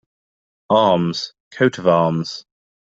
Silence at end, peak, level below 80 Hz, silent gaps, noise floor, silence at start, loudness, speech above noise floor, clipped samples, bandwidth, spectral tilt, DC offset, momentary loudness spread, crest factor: 0.55 s; -2 dBFS; -60 dBFS; 1.40-1.51 s; under -90 dBFS; 0.7 s; -18 LUFS; over 73 dB; under 0.1%; 7.8 kHz; -6 dB/octave; under 0.1%; 14 LU; 18 dB